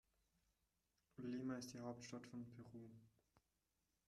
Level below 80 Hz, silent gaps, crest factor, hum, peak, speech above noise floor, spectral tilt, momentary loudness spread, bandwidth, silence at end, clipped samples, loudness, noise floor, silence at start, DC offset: -86 dBFS; none; 20 dB; none; -36 dBFS; 36 dB; -5.5 dB/octave; 15 LU; 13 kHz; 0.7 s; under 0.1%; -53 LUFS; -89 dBFS; 1.15 s; under 0.1%